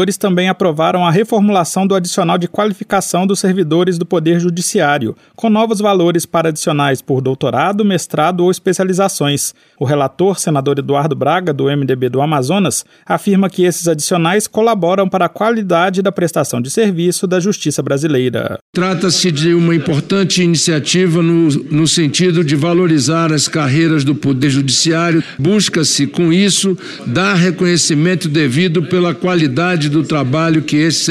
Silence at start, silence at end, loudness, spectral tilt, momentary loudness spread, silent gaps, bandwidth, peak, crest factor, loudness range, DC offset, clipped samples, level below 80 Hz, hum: 0 s; 0 s; -13 LUFS; -5 dB/octave; 4 LU; 18.61-18.73 s; 15.5 kHz; 0 dBFS; 12 dB; 2 LU; under 0.1%; under 0.1%; -56 dBFS; none